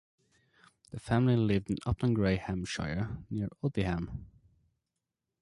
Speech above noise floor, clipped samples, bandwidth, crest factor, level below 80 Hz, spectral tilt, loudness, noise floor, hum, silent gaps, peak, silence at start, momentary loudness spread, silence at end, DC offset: 56 dB; under 0.1%; 11.5 kHz; 16 dB; -48 dBFS; -7 dB/octave; -32 LUFS; -87 dBFS; none; none; -16 dBFS; 0.95 s; 12 LU; 1.15 s; under 0.1%